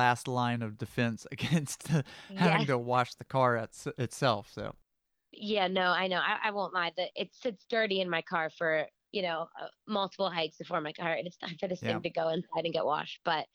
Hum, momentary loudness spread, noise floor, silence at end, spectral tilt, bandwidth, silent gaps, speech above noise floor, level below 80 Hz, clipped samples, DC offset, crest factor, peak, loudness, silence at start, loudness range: none; 9 LU; -68 dBFS; 0.1 s; -5 dB/octave; 15 kHz; none; 36 dB; -70 dBFS; under 0.1%; under 0.1%; 20 dB; -12 dBFS; -32 LUFS; 0 s; 3 LU